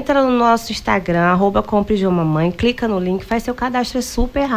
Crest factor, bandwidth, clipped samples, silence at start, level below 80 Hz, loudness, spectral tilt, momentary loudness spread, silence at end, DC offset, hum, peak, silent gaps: 14 dB; 16 kHz; under 0.1%; 0 s; -32 dBFS; -17 LUFS; -6 dB/octave; 6 LU; 0 s; under 0.1%; none; -4 dBFS; none